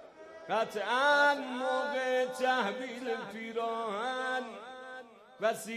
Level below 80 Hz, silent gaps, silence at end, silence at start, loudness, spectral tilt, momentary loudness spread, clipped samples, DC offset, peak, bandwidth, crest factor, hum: -82 dBFS; none; 0 s; 0 s; -32 LUFS; -3 dB/octave; 19 LU; under 0.1%; under 0.1%; -16 dBFS; 15.5 kHz; 16 dB; none